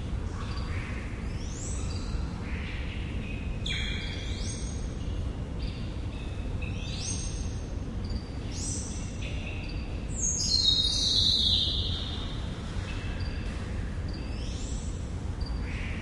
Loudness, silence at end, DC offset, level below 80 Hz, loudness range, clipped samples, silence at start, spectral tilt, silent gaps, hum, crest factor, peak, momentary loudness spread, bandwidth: -31 LUFS; 0 s; under 0.1%; -36 dBFS; 10 LU; under 0.1%; 0 s; -3 dB/octave; none; none; 20 dB; -12 dBFS; 13 LU; 11.5 kHz